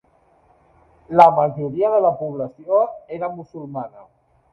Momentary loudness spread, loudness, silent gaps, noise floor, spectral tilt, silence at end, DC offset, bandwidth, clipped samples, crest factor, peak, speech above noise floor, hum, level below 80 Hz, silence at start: 19 LU; -18 LUFS; none; -57 dBFS; -8.5 dB/octave; 0.5 s; under 0.1%; 7 kHz; under 0.1%; 20 dB; 0 dBFS; 38 dB; none; -62 dBFS; 1.1 s